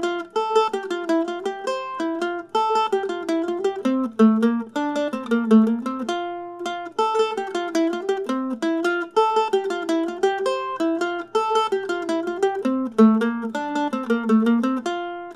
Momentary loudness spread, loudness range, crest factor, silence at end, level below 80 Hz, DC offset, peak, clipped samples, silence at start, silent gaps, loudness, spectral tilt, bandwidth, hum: 10 LU; 3 LU; 16 dB; 0 s; -74 dBFS; under 0.1%; -4 dBFS; under 0.1%; 0 s; none; -22 LUFS; -5.5 dB/octave; 12 kHz; none